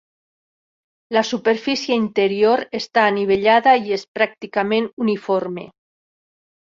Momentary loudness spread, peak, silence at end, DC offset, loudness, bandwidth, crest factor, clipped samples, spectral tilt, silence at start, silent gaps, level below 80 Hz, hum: 8 LU; -2 dBFS; 1 s; under 0.1%; -18 LUFS; 7.6 kHz; 18 dB; under 0.1%; -5 dB/octave; 1.1 s; 4.08-4.15 s, 4.93-4.97 s; -62 dBFS; none